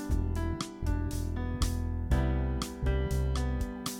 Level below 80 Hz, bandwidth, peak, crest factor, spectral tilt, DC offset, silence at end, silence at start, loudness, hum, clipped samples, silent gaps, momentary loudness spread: -34 dBFS; 18 kHz; -16 dBFS; 16 dB; -6 dB/octave; under 0.1%; 0 s; 0 s; -33 LUFS; none; under 0.1%; none; 5 LU